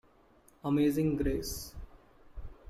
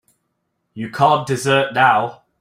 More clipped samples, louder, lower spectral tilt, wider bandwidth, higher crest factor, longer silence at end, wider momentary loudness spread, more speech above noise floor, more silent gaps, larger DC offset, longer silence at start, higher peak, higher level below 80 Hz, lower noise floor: neither; second, -32 LUFS vs -16 LUFS; first, -6 dB/octave vs -4.5 dB/octave; about the same, 15 kHz vs 15.5 kHz; about the same, 16 dB vs 18 dB; second, 0 s vs 0.25 s; first, 23 LU vs 14 LU; second, 33 dB vs 55 dB; neither; neither; about the same, 0.65 s vs 0.75 s; second, -18 dBFS vs -2 dBFS; first, -46 dBFS vs -60 dBFS; second, -63 dBFS vs -72 dBFS